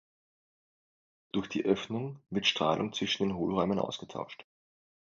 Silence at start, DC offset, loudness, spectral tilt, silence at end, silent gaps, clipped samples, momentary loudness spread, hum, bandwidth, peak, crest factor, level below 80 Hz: 1.35 s; under 0.1%; -32 LUFS; -5 dB/octave; 0.6 s; none; under 0.1%; 12 LU; none; 7.6 kHz; -12 dBFS; 22 dB; -64 dBFS